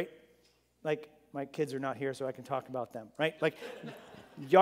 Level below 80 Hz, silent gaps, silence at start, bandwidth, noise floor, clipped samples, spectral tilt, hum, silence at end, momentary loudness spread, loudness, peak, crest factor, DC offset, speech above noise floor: -80 dBFS; none; 0 s; 16 kHz; -69 dBFS; under 0.1%; -6 dB/octave; none; 0 s; 15 LU; -36 LUFS; -10 dBFS; 24 dB; under 0.1%; 33 dB